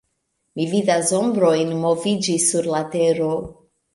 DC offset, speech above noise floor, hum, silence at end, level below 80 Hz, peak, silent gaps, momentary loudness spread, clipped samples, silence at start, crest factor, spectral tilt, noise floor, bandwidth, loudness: under 0.1%; 53 dB; none; 0.4 s; -56 dBFS; -4 dBFS; none; 9 LU; under 0.1%; 0.55 s; 16 dB; -4.5 dB/octave; -72 dBFS; 11.5 kHz; -19 LUFS